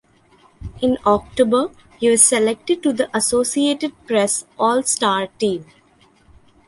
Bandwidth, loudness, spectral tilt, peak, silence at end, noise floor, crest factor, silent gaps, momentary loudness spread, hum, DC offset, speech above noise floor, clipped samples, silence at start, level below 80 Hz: 12.5 kHz; -18 LUFS; -2.5 dB/octave; 0 dBFS; 1.05 s; -54 dBFS; 20 dB; none; 10 LU; none; under 0.1%; 36 dB; under 0.1%; 0.6 s; -48 dBFS